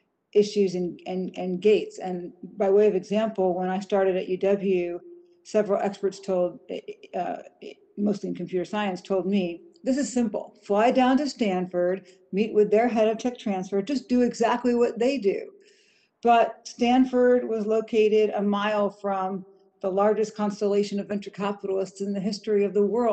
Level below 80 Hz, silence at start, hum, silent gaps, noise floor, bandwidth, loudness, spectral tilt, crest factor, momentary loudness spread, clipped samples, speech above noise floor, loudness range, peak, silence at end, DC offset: -66 dBFS; 0.35 s; none; none; -63 dBFS; 8.8 kHz; -25 LUFS; -6 dB/octave; 16 dB; 12 LU; under 0.1%; 39 dB; 6 LU; -10 dBFS; 0 s; under 0.1%